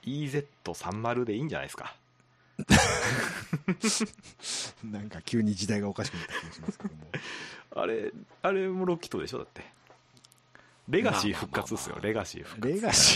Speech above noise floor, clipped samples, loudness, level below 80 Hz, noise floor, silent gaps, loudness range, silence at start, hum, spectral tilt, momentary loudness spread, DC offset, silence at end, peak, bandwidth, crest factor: 34 dB; under 0.1%; -30 LUFS; -52 dBFS; -64 dBFS; none; 5 LU; 0.05 s; none; -3.5 dB/octave; 15 LU; under 0.1%; 0 s; -6 dBFS; 14 kHz; 24 dB